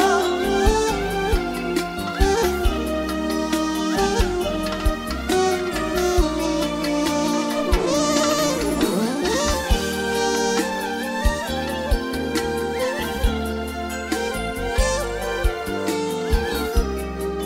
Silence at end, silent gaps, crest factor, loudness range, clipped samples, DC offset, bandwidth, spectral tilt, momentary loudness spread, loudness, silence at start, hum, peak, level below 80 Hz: 0 s; none; 18 dB; 4 LU; under 0.1%; under 0.1%; 16 kHz; -4.5 dB/octave; 6 LU; -22 LUFS; 0 s; none; -4 dBFS; -28 dBFS